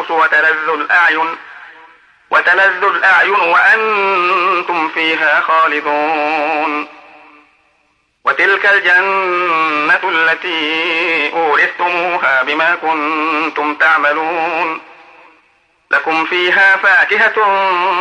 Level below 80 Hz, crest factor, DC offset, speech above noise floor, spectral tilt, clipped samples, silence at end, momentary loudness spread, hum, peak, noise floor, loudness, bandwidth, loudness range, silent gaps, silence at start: -70 dBFS; 14 dB; under 0.1%; 46 dB; -3 dB/octave; under 0.1%; 0 s; 7 LU; none; 0 dBFS; -59 dBFS; -12 LUFS; 10 kHz; 4 LU; none; 0 s